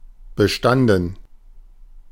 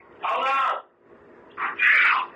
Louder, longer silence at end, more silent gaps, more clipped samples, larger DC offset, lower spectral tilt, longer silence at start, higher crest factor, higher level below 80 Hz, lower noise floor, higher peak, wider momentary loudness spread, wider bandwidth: first, -18 LUFS vs -21 LUFS; about the same, 0.1 s vs 0.05 s; neither; neither; neither; first, -6 dB/octave vs -1.5 dB/octave; second, 0.05 s vs 0.2 s; about the same, 18 dB vs 16 dB; first, -40 dBFS vs -74 dBFS; second, -43 dBFS vs -52 dBFS; first, -4 dBFS vs -8 dBFS; about the same, 13 LU vs 14 LU; first, 16.5 kHz vs 11 kHz